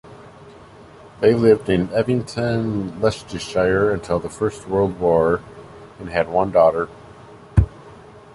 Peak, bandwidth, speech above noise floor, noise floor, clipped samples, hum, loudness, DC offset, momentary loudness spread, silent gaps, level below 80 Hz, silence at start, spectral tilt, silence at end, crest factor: -2 dBFS; 11.5 kHz; 25 dB; -43 dBFS; under 0.1%; none; -20 LUFS; under 0.1%; 10 LU; none; -36 dBFS; 0.05 s; -7 dB/octave; 0.15 s; 18 dB